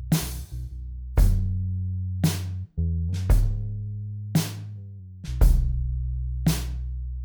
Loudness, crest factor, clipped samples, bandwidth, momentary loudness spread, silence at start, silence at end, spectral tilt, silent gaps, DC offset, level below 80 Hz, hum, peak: -27 LUFS; 18 dB; under 0.1%; over 20 kHz; 13 LU; 0 s; 0 s; -6 dB/octave; none; under 0.1%; -26 dBFS; none; -6 dBFS